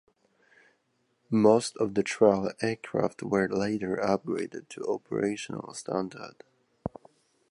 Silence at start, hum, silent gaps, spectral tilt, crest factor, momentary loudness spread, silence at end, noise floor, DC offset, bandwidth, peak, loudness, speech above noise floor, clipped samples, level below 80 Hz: 1.3 s; none; none; -5.5 dB/octave; 22 dB; 16 LU; 0.65 s; -73 dBFS; under 0.1%; 11.5 kHz; -8 dBFS; -28 LUFS; 45 dB; under 0.1%; -64 dBFS